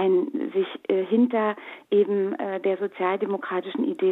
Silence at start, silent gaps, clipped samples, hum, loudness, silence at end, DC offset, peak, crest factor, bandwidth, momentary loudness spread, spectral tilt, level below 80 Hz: 0 s; none; under 0.1%; none; -25 LUFS; 0 s; under 0.1%; -10 dBFS; 14 dB; 4 kHz; 6 LU; -8.5 dB/octave; -80 dBFS